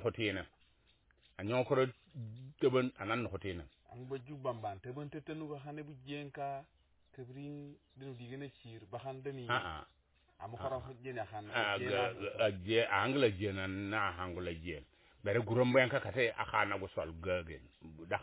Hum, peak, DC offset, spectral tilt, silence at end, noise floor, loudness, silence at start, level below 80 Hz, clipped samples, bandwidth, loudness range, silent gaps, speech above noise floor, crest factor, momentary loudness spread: none; -16 dBFS; under 0.1%; -4 dB/octave; 0 s; -71 dBFS; -37 LUFS; 0 s; -60 dBFS; under 0.1%; 4 kHz; 12 LU; none; 34 dB; 22 dB; 18 LU